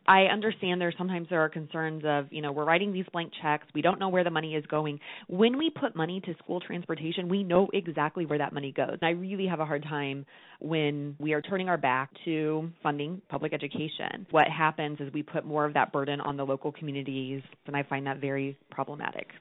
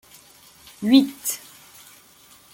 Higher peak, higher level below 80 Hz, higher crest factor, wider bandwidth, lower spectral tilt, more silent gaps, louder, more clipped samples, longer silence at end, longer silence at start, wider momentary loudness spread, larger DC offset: second, -8 dBFS vs -4 dBFS; second, -74 dBFS vs -66 dBFS; about the same, 22 dB vs 22 dB; second, 4 kHz vs 17 kHz; about the same, -4 dB/octave vs -3.5 dB/octave; neither; second, -30 LUFS vs -21 LUFS; neither; second, 0 s vs 1.15 s; second, 0.05 s vs 0.8 s; second, 10 LU vs 17 LU; neither